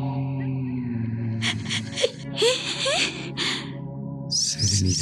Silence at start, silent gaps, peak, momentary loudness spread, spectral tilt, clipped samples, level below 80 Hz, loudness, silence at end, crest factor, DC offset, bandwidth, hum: 0 s; none; -6 dBFS; 8 LU; -3.5 dB/octave; under 0.1%; -56 dBFS; -25 LUFS; 0 s; 20 dB; under 0.1%; 13.5 kHz; none